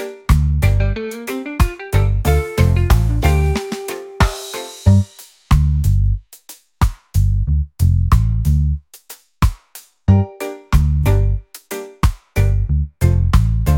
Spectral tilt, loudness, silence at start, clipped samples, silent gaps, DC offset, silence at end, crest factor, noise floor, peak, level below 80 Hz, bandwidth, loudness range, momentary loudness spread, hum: -6.5 dB/octave; -18 LUFS; 0 s; under 0.1%; none; under 0.1%; 0 s; 16 dB; -43 dBFS; 0 dBFS; -20 dBFS; 17 kHz; 2 LU; 12 LU; none